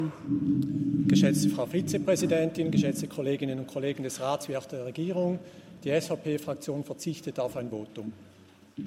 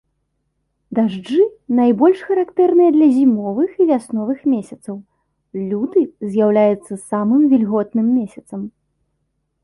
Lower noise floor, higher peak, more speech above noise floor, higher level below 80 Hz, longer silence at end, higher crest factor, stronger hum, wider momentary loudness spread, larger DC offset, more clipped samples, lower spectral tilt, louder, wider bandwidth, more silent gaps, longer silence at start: second, -50 dBFS vs -70 dBFS; second, -10 dBFS vs -4 dBFS; second, 21 dB vs 55 dB; about the same, -66 dBFS vs -62 dBFS; second, 0 s vs 0.95 s; about the same, 18 dB vs 14 dB; neither; second, 13 LU vs 17 LU; neither; neither; second, -6 dB/octave vs -8 dB/octave; second, -29 LUFS vs -16 LUFS; first, 16 kHz vs 11.5 kHz; neither; second, 0 s vs 0.9 s